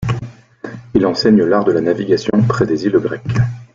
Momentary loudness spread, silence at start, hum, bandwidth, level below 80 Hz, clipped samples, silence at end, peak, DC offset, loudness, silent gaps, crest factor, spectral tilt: 17 LU; 0 s; none; 7.6 kHz; -44 dBFS; under 0.1%; 0.1 s; -2 dBFS; under 0.1%; -15 LUFS; none; 14 dB; -7.5 dB/octave